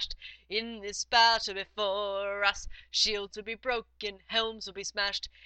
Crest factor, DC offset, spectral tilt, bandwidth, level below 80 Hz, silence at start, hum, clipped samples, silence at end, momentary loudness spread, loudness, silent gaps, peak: 22 dB; under 0.1%; -0.5 dB/octave; 9 kHz; -54 dBFS; 0 s; none; under 0.1%; 0.15 s; 14 LU; -30 LUFS; none; -8 dBFS